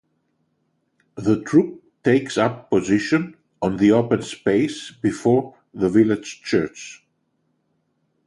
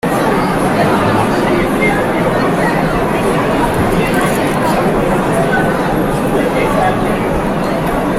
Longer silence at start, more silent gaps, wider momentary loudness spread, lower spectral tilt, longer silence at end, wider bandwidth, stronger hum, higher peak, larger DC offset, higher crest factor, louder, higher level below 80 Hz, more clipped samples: first, 1.15 s vs 0.05 s; neither; first, 12 LU vs 2 LU; about the same, -6 dB/octave vs -6 dB/octave; first, 1.3 s vs 0 s; second, 11.5 kHz vs 16.5 kHz; neither; about the same, -4 dBFS vs -2 dBFS; neither; first, 18 dB vs 12 dB; second, -21 LUFS vs -13 LUFS; second, -56 dBFS vs -30 dBFS; neither